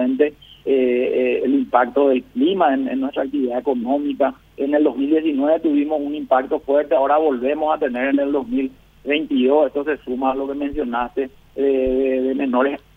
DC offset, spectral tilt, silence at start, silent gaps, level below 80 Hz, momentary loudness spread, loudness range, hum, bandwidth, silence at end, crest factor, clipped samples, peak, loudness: under 0.1%; -7.5 dB/octave; 0 s; none; -48 dBFS; 7 LU; 2 LU; none; 3.9 kHz; 0.2 s; 18 dB; under 0.1%; -2 dBFS; -19 LUFS